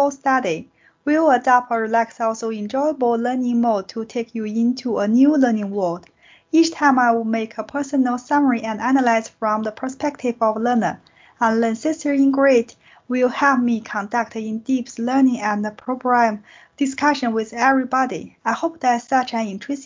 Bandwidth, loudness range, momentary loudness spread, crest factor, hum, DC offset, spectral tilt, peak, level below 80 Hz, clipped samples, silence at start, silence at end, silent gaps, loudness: 7.6 kHz; 2 LU; 10 LU; 16 dB; none; under 0.1%; -5 dB/octave; -2 dBFS; -64 dBFS; under 0.1%; 0 s; 0 s; none; -20 LUFS